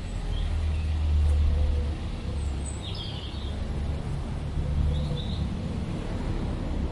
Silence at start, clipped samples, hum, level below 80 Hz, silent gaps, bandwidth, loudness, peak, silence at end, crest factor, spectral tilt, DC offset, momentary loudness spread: 0 s; under 0.1%; none; -30 dBFS; none; 11 kHz; -30 LUFS; -14 dBFS; 0 s; 14 dB; -6.5 dB/octave; under 0.1%; 8 LU